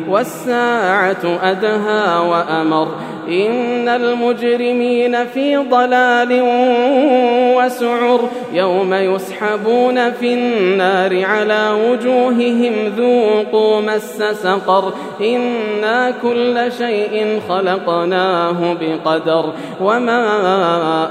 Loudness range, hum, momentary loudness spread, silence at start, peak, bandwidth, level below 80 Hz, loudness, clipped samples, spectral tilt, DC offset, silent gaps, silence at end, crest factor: 3 LU; none; 5 LU; 0 s; 0 dBFS; 15.5 kHz; -72 dBFS; -15 LUFS; under 0.1%; -5.5 dB/octave; under 0.1%; none; 0 s; 14 dB